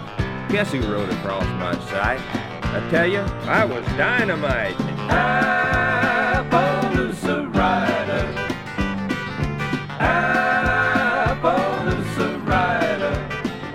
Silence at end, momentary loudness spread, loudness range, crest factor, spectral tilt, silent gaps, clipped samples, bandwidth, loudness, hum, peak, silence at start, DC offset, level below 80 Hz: 0 s; 7 LU; 3 LU; 18 dB; -6 dB/octave; none; under 0.1%; 16 kHz; -21 LUFS; none; -4 dBFS; 0 s; under 0.1%; -36 dBFS